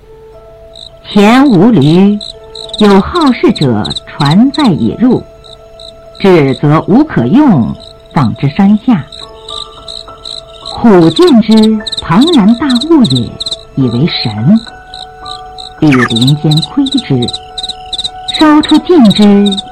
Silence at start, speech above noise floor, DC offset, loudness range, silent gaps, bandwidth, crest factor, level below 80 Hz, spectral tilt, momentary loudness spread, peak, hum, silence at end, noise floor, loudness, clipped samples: 0.8 s; 27 dB; under 0.1%; 4 LU; none; 12.5 kHz; 8 dB; -36 dBFS; -6.5 dB/octave; 18 LU; 0 dBFS; none; 0 s; -33 dBFS; -8 LUFS; 1%